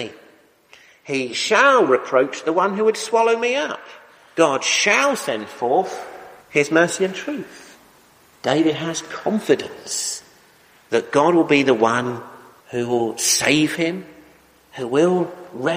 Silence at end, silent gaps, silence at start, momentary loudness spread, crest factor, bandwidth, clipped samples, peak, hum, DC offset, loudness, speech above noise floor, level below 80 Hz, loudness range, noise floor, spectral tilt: 0 s; none; 0 s; 14 LU; 20 dB; 15.5 kHz; under 0.1%; -2 dBFS; none; under 0.1%; -19 LUFS; 34 dB; -64 dBFS; 5 LU; -52 dBFS; -3.5 dB/octave